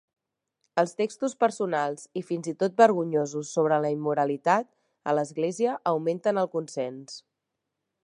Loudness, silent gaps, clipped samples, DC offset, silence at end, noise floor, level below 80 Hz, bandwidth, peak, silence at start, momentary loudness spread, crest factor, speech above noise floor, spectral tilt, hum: -26 LUFS; none; under 0.1%; under 0.1%; 0.85 s; -83 dBFS; -82 dBFS; 11.5 kHz; -6 dBFS; 0.75 s; 12 LU; 22 dB; 58 dB; -5.5 dB/octave; none